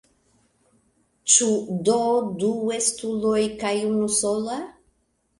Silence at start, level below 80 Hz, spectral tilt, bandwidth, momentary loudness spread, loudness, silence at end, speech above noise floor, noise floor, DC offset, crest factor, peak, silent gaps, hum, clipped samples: 1.25 s; -60 dBFS; -3 dB/octave; 11.5 kHz; 11 LU; -22 LUFS; 0.7 s; 46 dB; -69 dBFS; under 0.1%; 20 dB; -4 dBFS; none; none; under 0.1%